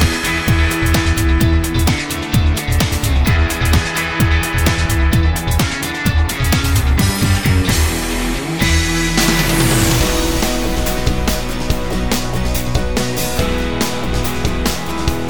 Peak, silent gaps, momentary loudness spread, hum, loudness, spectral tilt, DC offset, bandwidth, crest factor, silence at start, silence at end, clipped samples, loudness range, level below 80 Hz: 0 dBFS; none; 6 LU; none; -16 LUFS; -4.5 dB/octave; under 0.1%; over 20 kHz; 14 dB; 0 s; 0 s; under 0.1%; 4 LU; -20 dBFS